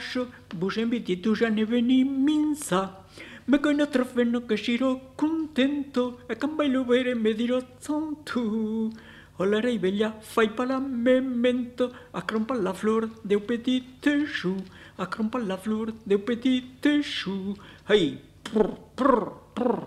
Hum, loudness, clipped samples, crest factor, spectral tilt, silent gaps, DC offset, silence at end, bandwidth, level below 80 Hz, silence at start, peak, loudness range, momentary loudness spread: 50 Hz at -60 dBFS; -26 LUFS; under 0.1%; 20 dB; -5.5 dB/octave; none; under 0.1%; 0 s; 13 kHz; -58 dBFS; 0 s; -6 dBFS; 3 LU; 9 LU